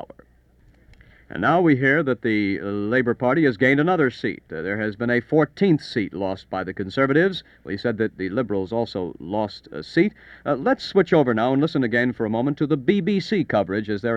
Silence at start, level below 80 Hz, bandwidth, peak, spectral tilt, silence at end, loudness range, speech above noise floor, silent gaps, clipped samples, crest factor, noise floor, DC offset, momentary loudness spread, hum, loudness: 0 s; -56 dBFS; 8.6 kHz; -4 dBFS; -7.5 dB/octave; 0 s; 4 LU; 34 dB; none; under 0.1%; 18 dB; -55 dBFS; under 0.1%; 10 LU; none; -22 LUFS